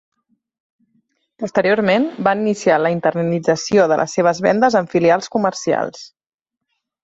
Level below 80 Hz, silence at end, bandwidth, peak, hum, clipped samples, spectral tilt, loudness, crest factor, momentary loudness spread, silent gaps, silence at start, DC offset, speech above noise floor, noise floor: -60 dBFS; 0.95 s; 8 kHz; -2 dBFS; none; under 0.1%; -5.5 dB/octave; -17 LUFS; 16 dB; 6 LU; none; 1.4 s; under 0.1%; 68 dB; -84 dBFS